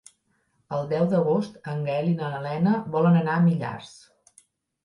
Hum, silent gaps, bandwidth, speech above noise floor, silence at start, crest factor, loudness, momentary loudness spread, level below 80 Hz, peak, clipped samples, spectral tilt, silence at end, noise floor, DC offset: none; none; 11 kHz; 46 dB; 0.7 s; 14 dB; -24 LUFS; 12 LU; -66 dBFS; -10 dBFS; under 0.1%; -8.5 dB/octave; 0.95 s; -70 dBFS; under 0.1%